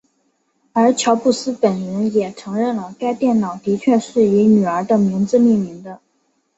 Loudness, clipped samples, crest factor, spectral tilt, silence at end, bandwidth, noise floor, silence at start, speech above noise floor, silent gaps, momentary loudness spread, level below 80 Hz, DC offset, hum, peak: -17 LUFS; under 0.1%; 16 dB; -6 dB/octave; 0.6 s; 8.2 kHz; -65 dBFS; 0.75 s; 49 dB; none; 9 LU; -60 dBFS; under 0.1%; none; -2 dBFS